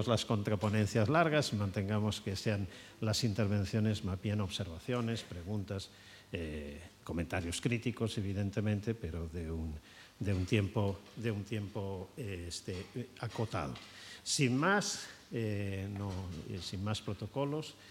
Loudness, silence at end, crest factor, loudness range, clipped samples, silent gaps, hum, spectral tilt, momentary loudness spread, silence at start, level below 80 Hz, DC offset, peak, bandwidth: -36 LUFS; 0 s; 22 dB; 6 LU; under 0.1%; none; none; -5.5 dB/octave; 12 LU; 0 s; -60 dBFS; under 0.1%; -14 dBFS; 15.5 kHz